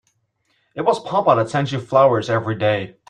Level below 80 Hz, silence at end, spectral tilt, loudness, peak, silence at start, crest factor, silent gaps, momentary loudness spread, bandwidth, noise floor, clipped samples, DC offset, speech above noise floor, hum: -60 dBFS; 0.2 s; -6.5 dB/octave; -18 LUFS; -2 dBFS; 0.75 s; 18 dB; none; 7 LU; 10.5 kHz; -67 dBFS; under 0.1%; under 0.1%; 49 dB; none